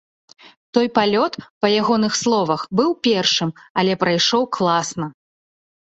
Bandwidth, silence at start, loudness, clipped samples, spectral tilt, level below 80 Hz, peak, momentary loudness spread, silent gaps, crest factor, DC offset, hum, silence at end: 8.2 kHz; 0.75 s; -18 LUFS; under 0.1%; -4 dB/octave; -60 dBFS; -2 dBFS; 6 LU; 1.50-1.61 s, 3.70-3.75 s; 18 dB; under 0.1%; none; 0.8 s